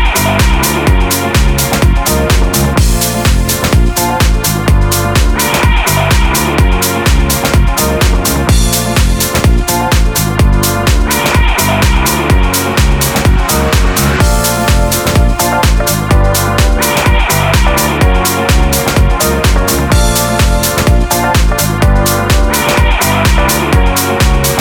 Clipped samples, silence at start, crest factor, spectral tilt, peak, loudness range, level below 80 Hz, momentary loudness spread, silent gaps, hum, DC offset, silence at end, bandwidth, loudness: under 0.1%; 0 s; 8 dB; -4 dB/octave; 0 dBFS; 1 LU; -12 dBFS; 1 LU; none; none; under 0.1%; 0 s; 19.5 kHz; -10 LUFS